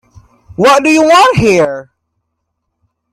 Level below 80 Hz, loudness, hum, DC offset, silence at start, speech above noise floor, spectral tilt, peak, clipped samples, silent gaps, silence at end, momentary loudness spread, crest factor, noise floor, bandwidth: -42 dBFS; -8 LUFS; none; under 0.1%; 0.6 s; 62 dB; -4.5 dB/octave; 0 dBFS; under 0.1%; none; 1.3 s; 15 LU; 12 dB; -70 dBFS; 15.5 kHz